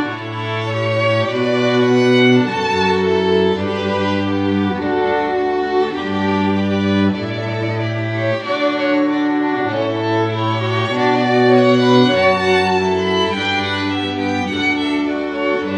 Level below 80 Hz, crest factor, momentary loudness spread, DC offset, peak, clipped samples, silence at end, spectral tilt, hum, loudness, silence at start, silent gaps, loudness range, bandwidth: -54 dBFS; 16 dB; 8 LU; under 0.1%; 0 dBFS; under 0.1%; 0 s; -6.5 dB/octave; none; -16 LUFS; 0 s; none; 4 LU; 10 kHz